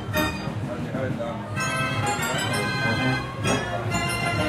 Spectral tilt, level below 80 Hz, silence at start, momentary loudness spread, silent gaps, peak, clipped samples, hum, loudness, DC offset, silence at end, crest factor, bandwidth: -4.5 dB/octave; -46 dBFS; 0 s; 6 LU; none; -10 dBFS; under 0.1%; none; -25 LUFS; under 0.1%; 0 s; 16 dB; 16.5 kHz